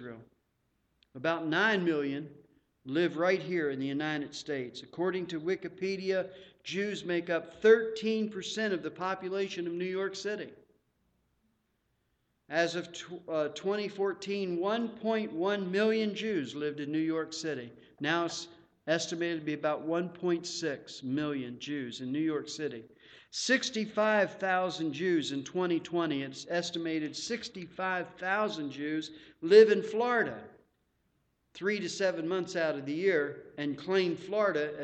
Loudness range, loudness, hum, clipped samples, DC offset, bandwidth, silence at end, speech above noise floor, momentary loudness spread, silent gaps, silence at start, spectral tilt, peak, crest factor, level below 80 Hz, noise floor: 7 LU; -32 LUFS; none; under 0.1%; under 0.1%; 8.8 kHz; 0 s; 46 dB; 10 LU; none; 0 s; -4.5 dB/octave; -8 dBFS; 24 dB; -76 dBFS; -77 dBFS